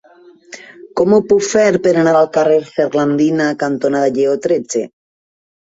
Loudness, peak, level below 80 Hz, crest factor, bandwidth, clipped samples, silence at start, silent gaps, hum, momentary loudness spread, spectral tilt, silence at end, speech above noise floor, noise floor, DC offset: -14 LUFS; -2 dBFS; -56 dBFS; 14 dB; 8 kHz; under 0.1%; 0.5 s; none; none; 12 LU; -5.5 dB/octave; 0.8 s; 31 dB; -44 dBFS; under 0.1%